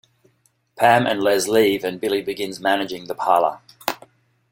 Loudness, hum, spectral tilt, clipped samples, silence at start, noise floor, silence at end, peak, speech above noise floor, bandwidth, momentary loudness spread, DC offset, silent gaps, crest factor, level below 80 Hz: -20 LUFS; none; -4 dB/octave; under 0.1%; 0.8 s; -64 dBFS; 0.55 s; -2 dBFS; 45 dB; 16.5 kHz; 12 LU; under 0.1%; none; 20 dB; -62 dBFS